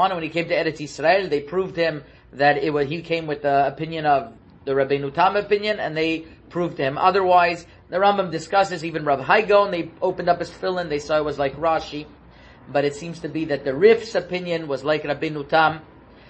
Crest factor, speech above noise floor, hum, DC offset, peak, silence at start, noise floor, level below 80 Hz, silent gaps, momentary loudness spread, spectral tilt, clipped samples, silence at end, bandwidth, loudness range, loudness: 20 dB; 26 dB; none; under 0.1%; -2 dBFS; 0 s; -47 dBFS; -54 dBFS; none; 9 LU; -5.5 dB/octave; under 0.1%; 0.45 s; 8.6 kHz; 3 LU; -21 LUFS